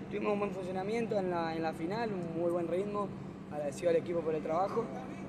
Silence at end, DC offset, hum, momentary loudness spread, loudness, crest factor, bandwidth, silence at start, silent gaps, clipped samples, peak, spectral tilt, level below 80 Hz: 0 s; under 0.1%; none; 7 LU; -35 LUFS; 16 dB; 13 kHz; 0 s; none; under 0.1%; -20 dBFS; -7 dB/octave; -64 dBFS